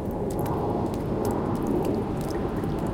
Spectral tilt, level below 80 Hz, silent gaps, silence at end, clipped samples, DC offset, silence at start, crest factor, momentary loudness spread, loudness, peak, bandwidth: -8 dB/octave; -40 dBFS; none; 0 s; under 0.1%; under 0.1%; 0 s; 12 dB; 3 LU; -28 LUFS; -14 dBFS; 17 kHz